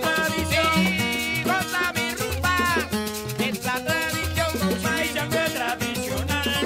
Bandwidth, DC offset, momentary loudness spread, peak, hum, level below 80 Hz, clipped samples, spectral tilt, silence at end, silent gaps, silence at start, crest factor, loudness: 16 kHz; under 0.1%; 6 LU; -8 dBFS; none; -42 dBFS; under 0.1%; -3.5 dB/octave; 0 s; none; 0 s; 16 dB; -23 LUFS